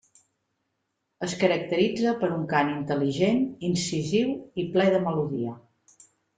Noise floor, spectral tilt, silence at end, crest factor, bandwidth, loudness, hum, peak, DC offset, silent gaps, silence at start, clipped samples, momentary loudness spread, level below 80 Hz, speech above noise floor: -79 dBFS; -5.5 dB/octave; 0.8 s; 20 dB; 9.4 kHz; -26 LUFS; none; -6 dBFS; under 0.1%; none; 1.2 s; under 0.1%; 8 LU; -64 dBFS; 53 dB